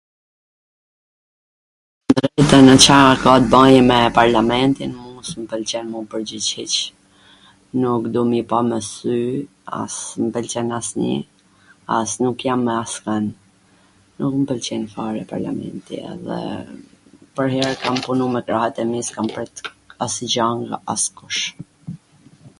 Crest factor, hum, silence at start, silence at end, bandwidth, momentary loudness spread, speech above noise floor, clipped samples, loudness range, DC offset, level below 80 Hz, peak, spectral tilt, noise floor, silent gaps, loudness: 18 dB; none; 2.1 s; 0.1 s; 16 kHz; 19 LU; 37 dB; 0.2%; 13 LU; under 0.1%; -46 dBFS; 0 dBFS; -4 dB/octave; -54 dBFS; none; -18 LUFS